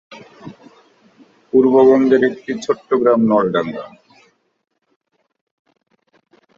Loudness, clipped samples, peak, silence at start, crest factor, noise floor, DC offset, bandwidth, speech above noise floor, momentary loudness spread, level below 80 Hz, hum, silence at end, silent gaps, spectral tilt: -15 LUFS; under 0.1%; -2 dBFS; 0.1 s; 16 dB; -69 dBFS; under 0.1%; 7.4 kHz; 55 dB; 26 LU; -60 dBFS; none; 2.7 s; none; -7 dB/octave